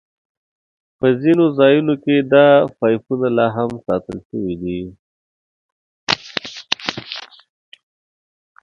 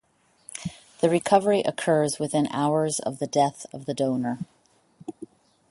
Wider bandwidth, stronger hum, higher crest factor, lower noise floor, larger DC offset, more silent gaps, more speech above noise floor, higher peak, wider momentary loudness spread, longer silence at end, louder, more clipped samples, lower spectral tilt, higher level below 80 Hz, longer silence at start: second, 7.4 kHz vs 11.5 kHz; neither; about the same, 18 dB vs 22 dB; first, under -90 dBFS vs -56 dBFS; neither; first, 4.25-4.30 s, 4.99-6.07 s vs none; first, over 75 dB vs 32 dB; first, 0 dBFS vs -4 dBFS; second, 16 LU vs 20 LU; first, 1.4 s vs 0.45 s; first, -17 LUFS vs -24 LUFS; neither; about the same, -6 dB/octave vs -5 dB/octave; first, -54 dBFS vs -66 dBFS; first, 1 s vs 0.55 s